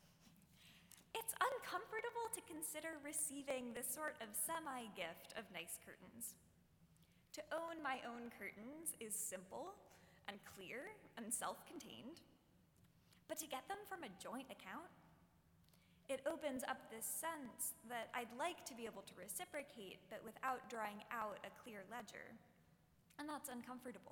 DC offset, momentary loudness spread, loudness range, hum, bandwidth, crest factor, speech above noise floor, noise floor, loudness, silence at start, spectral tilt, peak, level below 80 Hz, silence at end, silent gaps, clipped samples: under 0.1%; 13 LU; 7 LU; none; 18 kHz; 24 dB; 24 dB; -74 dBFS; -48 LUFS; 0 s; -2 dB/octave; -26 dBFS; -82 dBFS; 0 s; none; under 0.1%